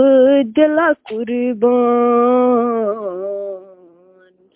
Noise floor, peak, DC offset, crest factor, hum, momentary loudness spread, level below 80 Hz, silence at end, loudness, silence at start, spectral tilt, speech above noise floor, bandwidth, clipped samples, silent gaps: -50 dBFS; -2 dBFS; under 0.1%; 14 dB; none; 12 LU; -62 dBFS; 0.9 s; -15 LUFS; 0 s; -9.5 dB/octave; 35 dB; 3.8 kHz; under 0.1%; none